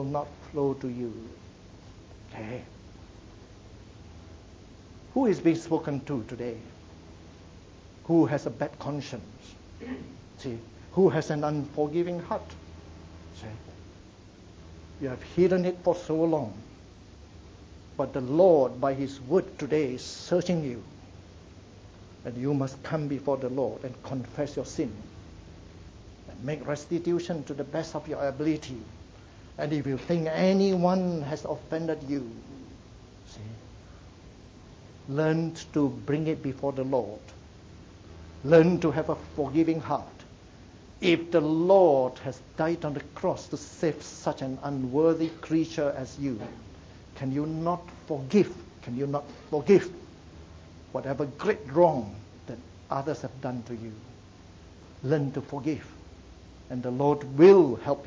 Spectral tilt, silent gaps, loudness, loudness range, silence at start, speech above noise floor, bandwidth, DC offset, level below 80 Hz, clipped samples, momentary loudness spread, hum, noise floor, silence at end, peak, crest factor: -7 dB/octave; none; -28 LUFS; 10 LU; 0 s; 23 dB; 7.8 kHz; under 0.1%; -54 dBFS; under 0.1%; 25 LU; none; -50 dBFS; 0 s; -6 dBFS; 22 dB